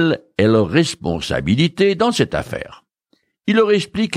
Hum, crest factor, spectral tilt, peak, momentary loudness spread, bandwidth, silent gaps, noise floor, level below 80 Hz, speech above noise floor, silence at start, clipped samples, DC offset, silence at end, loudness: none; 16 dB; -5.5 dB/octave; -2 dBFS; 12 LU; 14.5 kHz; none; -64 dBFS; -44 dBFS; 47 dB; 0 s; under 0.1%; under 0.1%; 0 s; -17 LUFS